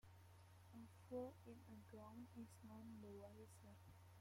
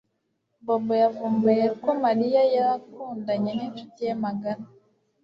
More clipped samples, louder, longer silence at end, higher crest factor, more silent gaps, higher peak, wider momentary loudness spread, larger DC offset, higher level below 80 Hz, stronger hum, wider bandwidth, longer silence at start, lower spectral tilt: neither; second, -60 LUFS vs -24 LUFS; second, 0 s vs 0.6 s; about the same, 20 dB vs 16 dB; neither; second, -40 dBFS vs -8 dBFS; about the same, 13 LU vs 13 LU; neither; second, -82 dBFS vs -70 dBFS; neither; first, 16.5 kHz vs 6 kHz; second, 0.05 s vs 0.65 s; second, -7 dB/octave vs -8.5 dB/octave